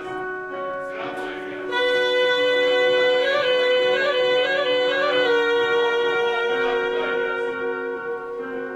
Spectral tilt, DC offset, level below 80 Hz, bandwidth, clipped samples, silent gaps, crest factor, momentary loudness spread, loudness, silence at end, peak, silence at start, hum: -3 dB/octave; under 0.1%; -60 dBFS; 9.6 kHz; under 0.1%; none; 14 dB; 11 LU; -21 LUFS; 0 s; -8 dBFS; 0 s; none